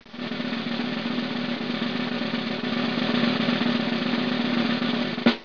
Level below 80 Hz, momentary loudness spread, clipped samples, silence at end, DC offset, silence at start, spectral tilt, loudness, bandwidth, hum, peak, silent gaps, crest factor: -62 dBFS; 5 LU; under 0.1%; 0 s; 0.4%; 0 s; -6 dB/octave; -25 LUFS; 5.4 kHz; none; -8 dBFS; none; 18 dB